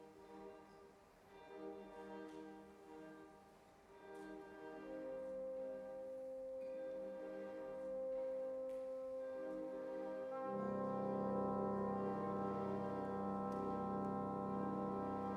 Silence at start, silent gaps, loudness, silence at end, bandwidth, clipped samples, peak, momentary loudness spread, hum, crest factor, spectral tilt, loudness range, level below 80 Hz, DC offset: 0 s; none; -46 LUFS; 0 s; 11.5 kHz; under 0.1%; -30 dBFS; 17 LU; none; 16 dB; -8.5 dB/octave; 14 LU; -74 dBFS; under 0.1%